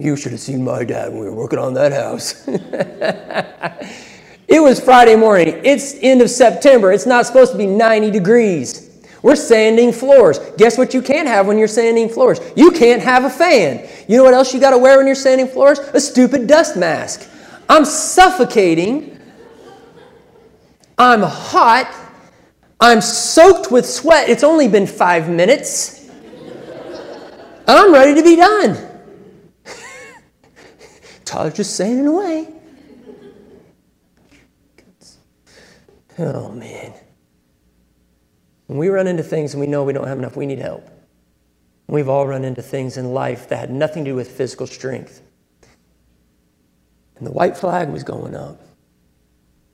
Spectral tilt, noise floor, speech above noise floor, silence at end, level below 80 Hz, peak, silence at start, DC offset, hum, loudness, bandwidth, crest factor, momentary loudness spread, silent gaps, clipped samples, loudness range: -4.5 dB/octave; -60 dBFS; 48 dB; 1.25 s; -50 dBFS; 0 dBFS; 0 s; under 0.1%; none; -12 LUFS; 15.5 kHz; 14 dB; 19 LU; none; under 0.1%; 15 LU